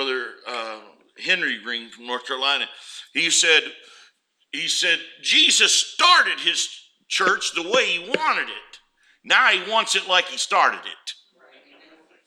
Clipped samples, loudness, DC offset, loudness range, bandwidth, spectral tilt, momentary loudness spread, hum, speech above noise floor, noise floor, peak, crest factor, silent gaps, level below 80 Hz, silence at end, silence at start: under 0.1%; -19 LUFS; under 0.1%; 4 LU; 16.5 kHz; 0.5 dB/octave; 16 LU; none; 38 dB; -59 dBFS; -2 dBFS; 20 dB; none; -74 dBFS; 1.15 s; 0 s